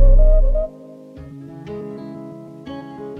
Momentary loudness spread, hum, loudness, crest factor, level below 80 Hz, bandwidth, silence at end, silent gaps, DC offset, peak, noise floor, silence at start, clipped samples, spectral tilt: 21 LU; none; -23 LUFS; 14 dB; -18 dBFS; 3.2 kHz; 0 s; none; under 0.1%; -4 dBFS; -39 dBFS; 0 s; under 0.1%; -10 dB/octave